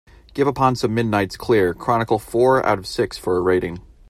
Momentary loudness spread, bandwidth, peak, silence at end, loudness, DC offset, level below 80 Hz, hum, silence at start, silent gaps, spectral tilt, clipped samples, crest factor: 6 LU; 15 kHz; -4 dBFS; 0.3 s; -19 LUFS; under 0.1%; -46 dBFS; none; 0.35 s; none; -6.5 dB/octave; under 0.1%; 16 dB